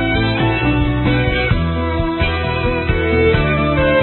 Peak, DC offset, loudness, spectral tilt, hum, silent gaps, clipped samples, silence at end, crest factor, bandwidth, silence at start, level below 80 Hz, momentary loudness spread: -2 dBFS; under 0.1%; -16 LUFS; -12 dB/octave; none; none; under 0.1%; 0 s; 14 dB; 4.3 kHz; 0 s; -24 dBFS; 4 LU